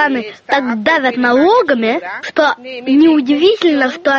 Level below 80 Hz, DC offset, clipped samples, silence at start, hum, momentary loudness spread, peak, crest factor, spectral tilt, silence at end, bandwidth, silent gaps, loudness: -58 dBFS; under 0.1%; under 0.1%; 0 s; none; 8 LU; 0 dBFS; 12 dB; -4.5 dB/octave; 0 s; 7.2 kHz; none; -13 LUFS